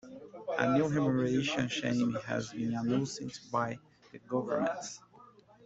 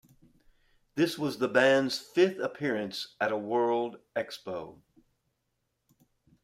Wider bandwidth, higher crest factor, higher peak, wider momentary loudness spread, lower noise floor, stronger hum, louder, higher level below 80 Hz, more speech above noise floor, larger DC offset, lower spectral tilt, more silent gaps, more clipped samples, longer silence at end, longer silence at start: second, 8 kHz vs 16 kHz; about the same, 20 dB vs 22 dB; about the same, -12 dBFS vs -10 dBFS; about the same, 13 LU vs 14 LU; second, -58 dBFS vs -80 dBFS; neither; second, -33 LUFS vs -29 LUFS; about the same, -68 dBFS vs -72 dBFS; second, 26 dB vs 51 dB; neither; about the same, -5.5 dB/octave vs -5 dB/octave; neither; neither; second, 0.4 s vs 1.7 s; second, 0.05 s vs 0.95 s